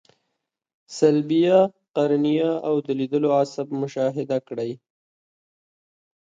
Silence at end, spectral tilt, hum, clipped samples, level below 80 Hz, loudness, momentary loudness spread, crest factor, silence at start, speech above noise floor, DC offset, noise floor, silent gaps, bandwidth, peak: 1.55 s; -7 dB/octave; none; under 0.1%; -72 dBFS; -22 LUFS; 12 LU; 18 dB; 0.9 s; 59 dB; under 0.1%; -80 dBFS; 1.90-1.94 s; 9 kHz; -4 dBFS